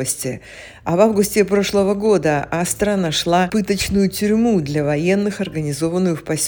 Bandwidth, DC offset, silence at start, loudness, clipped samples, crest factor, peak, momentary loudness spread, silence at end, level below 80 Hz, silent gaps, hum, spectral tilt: over 20 kHz; under 0.1%; 0 s; -18 LUFS; under 0.1%; 18 dB; 0 dBFS; 7 LU; 0 s; -44 dBFS; none; none; -5 dB/octave